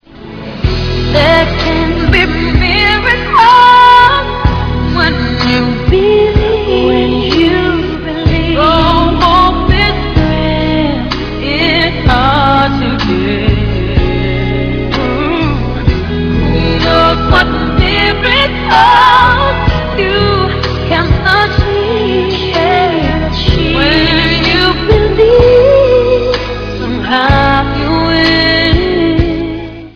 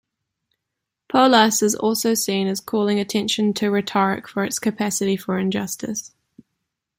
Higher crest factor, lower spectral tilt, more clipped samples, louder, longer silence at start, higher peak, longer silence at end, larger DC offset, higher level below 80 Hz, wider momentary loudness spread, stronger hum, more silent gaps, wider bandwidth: second, 10 dB vs 20 dB; first, -7 dB/octave vs -3.5 dB/octave; first, 0.9% vs under 0.1%; first, -10 LUFS vs -20 LUFS; second, 0.15 s vs 1.1 s; about the same, 0 dBFS vs -2 dBFS; second, 0.05 s vs 0.9 s; neither; first, -18 dBFS vs -64 dBFS; about the same, 8 LU vs 10 LU; neither; neither; second, 5.4 kHz vs 16.5 kHz